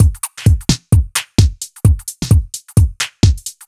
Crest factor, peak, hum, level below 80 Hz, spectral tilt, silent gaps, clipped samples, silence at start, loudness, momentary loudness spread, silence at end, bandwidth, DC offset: 14 dB; 0 dBFS; none; -20 dBFS; -5 dB/octave; none; under 0.1%; 0 s; -15 LUFS; 3 LU; 0.15 s; 15 kHz; under 0.1%